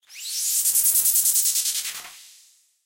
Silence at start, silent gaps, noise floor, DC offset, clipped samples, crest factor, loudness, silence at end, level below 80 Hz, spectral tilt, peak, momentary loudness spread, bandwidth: 0.1 s; none; -56 dBFS; under 0.1%; under 0.1%; 16 dB; -19 LUFS; 0.6 s; -76 dBFS; 4.5 dB/octave; -8 dBFS; 13 LU; 17.5 kHz